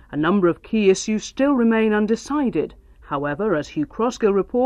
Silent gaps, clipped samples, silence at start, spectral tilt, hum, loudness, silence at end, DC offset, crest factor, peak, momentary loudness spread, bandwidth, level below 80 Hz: none; under 0.1%; 0.1 s; -5.5 dB/octave; none; -20 LUFS; 0 s; under 0.1%; 16 dB; -4 dBFS; 9 LU; 10 kHz; -48 dBFS